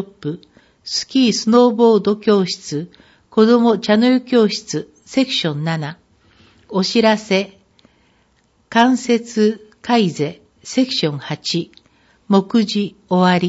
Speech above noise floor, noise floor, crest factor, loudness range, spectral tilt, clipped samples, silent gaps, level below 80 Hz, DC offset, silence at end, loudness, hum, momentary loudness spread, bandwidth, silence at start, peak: 43 dB; -59 dBFS; 18 dB; 5 LU; -5 dB/octave; under 0.1%; none; -62 dBFS; under 0.1%; 0 s; -17 LUFS; none; 14 LU; 8 kHz; 0 s; 0 dBFS